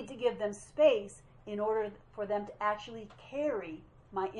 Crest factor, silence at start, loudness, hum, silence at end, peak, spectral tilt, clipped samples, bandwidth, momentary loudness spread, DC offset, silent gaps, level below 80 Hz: 20 dB; 0 s; -34 LUFS; none; 0 s; -14 dBFS; -5 dB/octave; under 0.1%; 11 kHz; 19 LU; under 0.1%; none; -64 dBFS